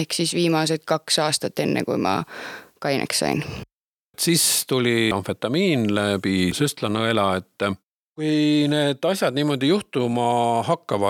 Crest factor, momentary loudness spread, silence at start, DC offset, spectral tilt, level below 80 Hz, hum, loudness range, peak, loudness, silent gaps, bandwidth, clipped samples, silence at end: 16 dB; 8 LU; 0 s; under 0.1%; -4 dB/octave; -58 dBFS; none; 2 LU; -6 dBFS; -21 LUFS; 3.73-4.14 s, 7.87-8.16 s; 18 kHz; under 0.1%; 0 s